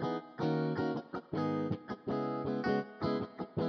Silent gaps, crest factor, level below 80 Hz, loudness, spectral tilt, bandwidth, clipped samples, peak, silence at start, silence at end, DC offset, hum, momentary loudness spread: none; 16 dB; -68 dBFS; -36 LUFS; -8.5 dB/octave; 6.6 kHz; under 0.1%; -20 dBFS; 0 s; 0 s; under 0.1%; none; 6 LU